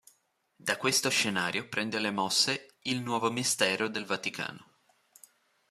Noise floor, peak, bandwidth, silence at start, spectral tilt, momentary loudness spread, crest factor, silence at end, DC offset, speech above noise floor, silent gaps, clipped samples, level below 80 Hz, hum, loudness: -71 dBFS; -8 dBFS; 15 kHz; 0.65 s; -2 dB/octave; 9 LU; 24 dB; 1.05 s; under 0.1%; 41 dB; none; under 0.1%; -76 dBFS; none; -29 LUFS